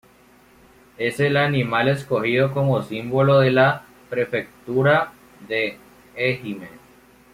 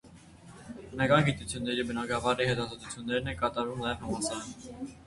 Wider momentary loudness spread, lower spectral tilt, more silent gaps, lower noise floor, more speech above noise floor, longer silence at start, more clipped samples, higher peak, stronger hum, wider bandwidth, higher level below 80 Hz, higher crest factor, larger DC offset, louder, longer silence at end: second, 13 LU vs 17 LU; first, -7 dB/octave vs -4.5 dB/octave; neither; about the same, -53 dBFS vs -52 dBFS; first, 33 dB vs 21 dB; first, 1 s vs 0.05 s; neither; about the same, -6 dBFS vs -8 dBFS; neither; first, 15.5 kHz vs 11.5 kHz; second, -58 dBFS vs -52 dBFS; second, 16 dB vs 24 dB; neither; first, -21 LUFS vs -31 LUFS; first, 0.55 s vs 0 s